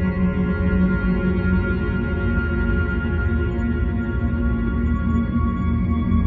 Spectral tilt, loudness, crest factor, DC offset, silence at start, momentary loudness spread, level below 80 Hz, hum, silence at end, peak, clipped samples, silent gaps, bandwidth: -10.5 dB/octave; -21 LUFS; 12 dB; under 0.1%; 0 s; 3 LU; -26 dBFS; none; 0 s; -8 dBFS; under 0.1%; none; 4.5 kHz